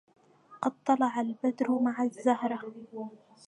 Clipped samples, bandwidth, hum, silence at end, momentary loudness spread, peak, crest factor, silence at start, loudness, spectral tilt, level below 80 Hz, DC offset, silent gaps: under 0.1%; 10 kHz; none; 0.3 s; 15 LU; -12 dBFS; 18 dB; 0.5 s; -30 LUFS; -6 dB/octave; -86 dBFS; under 0.1%; none